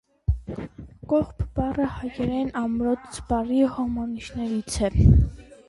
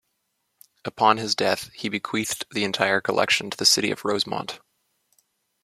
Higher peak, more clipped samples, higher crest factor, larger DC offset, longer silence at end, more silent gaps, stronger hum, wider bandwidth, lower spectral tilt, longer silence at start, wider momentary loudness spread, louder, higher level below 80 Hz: about the same, -4 dBFS vs -2 dBFS; neither; about the same, 20 dB vs 22 dB; neither; second, 0.25 s vs 1.05 s; neither; neither; second, 11.5 kHz vs 16 kHz; first, -7.5 dB/octave vs -2 dB/octave; second, 0.3 s vs 0.85 s; about the same, 12 LU vs 13 LU; second, -25 LUFS vs -22 LUFS; first, -30 dBFS vs -66 dBFS